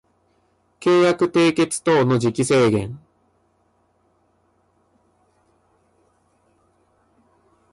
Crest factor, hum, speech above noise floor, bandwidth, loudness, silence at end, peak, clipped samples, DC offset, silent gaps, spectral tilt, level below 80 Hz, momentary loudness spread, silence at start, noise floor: 16 dB; none; 46 dB; 11.5 kHz; -18 LUFS; 4.75 s; -8 dBFS; under 0.1%; under 0.1%; none; -5.5 dB/octave; -58 dBFS; 8 LU; 0.8 s; -64 dBFS